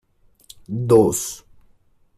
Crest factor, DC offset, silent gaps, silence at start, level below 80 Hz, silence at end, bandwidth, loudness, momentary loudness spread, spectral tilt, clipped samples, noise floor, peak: 20 dB; under 0.1%; none; 0.7 s; -52 dBFS; 0.8 s; 15 kHz; -19 LUFS; 16 LU; -6 dB/octave; under 0.1%; -57 dBFS; -2 dBFS